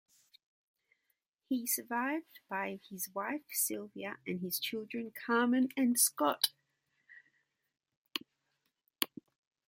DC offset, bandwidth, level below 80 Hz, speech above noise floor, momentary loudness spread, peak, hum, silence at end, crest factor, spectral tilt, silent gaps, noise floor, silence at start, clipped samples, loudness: under 0.1%; 16.5 kHz; -86 dBFS; 48 dB; 13 LU; -10 dBFS; none; 0.6 s; 28 dB; -2 dB/octave; 7.97-8.05 s; -83 dBFS; 1.5 s; under 0.1%; -35 LUFS